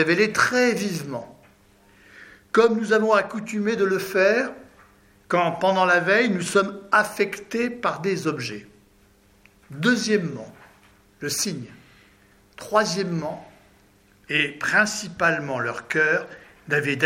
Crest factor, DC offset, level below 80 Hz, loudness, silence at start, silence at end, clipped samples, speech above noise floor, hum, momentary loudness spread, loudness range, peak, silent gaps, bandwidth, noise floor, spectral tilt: 20 dB; under 0.1%; -64 dBFS; -22 LUFS; 0 s; 0 s; under 0.1%; 35 dB; none; 15 LU; 6 LU; -4 dBFS; none; 16 kHz; -57 dBFS; -4 dB/octave